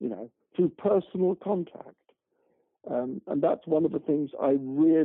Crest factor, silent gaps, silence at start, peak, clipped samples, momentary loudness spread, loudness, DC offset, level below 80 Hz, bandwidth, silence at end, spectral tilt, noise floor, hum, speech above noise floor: 14 dB; none; 0 s; -14 dBFS; under 0.1%; 13 LU; -28 LUFS; under 0.1%; -74 dBFS; 3.8 kHz; 0 s; -11.5 dB/octave; -72 dBFS; none; 46 dB